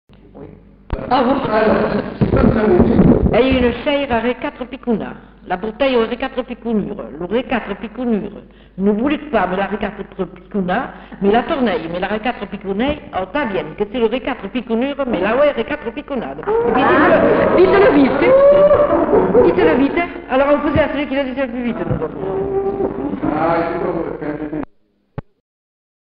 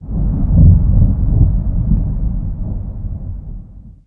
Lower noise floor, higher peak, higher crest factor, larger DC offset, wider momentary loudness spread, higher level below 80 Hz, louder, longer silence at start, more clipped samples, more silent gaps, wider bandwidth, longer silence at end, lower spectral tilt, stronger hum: first, -53 dBFS vs -34 dBFS; about the same, -2 dBFS vs 0 dBFS; about the same, 14 dB vs 14 dB; neither; second, 13 LU vs 18 LU; second, -34 dBFS vs -16 dBFS; about the same, -16 LUFS vs -15 LUFS; first, 0.35 s vs 0 s; neither; neither; first, 5.2 kHz vs 1.5 kHz; first, 1 s vs 0.15 s; second, -5.5 dB/octave vs -15 dB/octave; neither